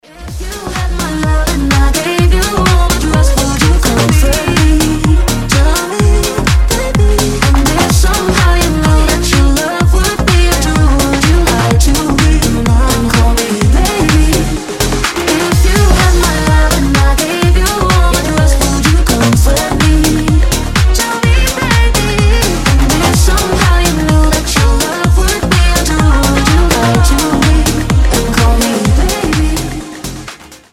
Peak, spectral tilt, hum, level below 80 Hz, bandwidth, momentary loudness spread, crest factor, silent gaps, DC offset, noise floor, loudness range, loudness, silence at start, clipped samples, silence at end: 0 dBFS; -4.5 dB/octave; none; -12 dBFS; 16.5 kHz; 3 LU; 10 dB; none; under 0.1%; -31 dBFS; 1 LU; -11 LUFS; 0.15 s; under 0.1%; 0.15 s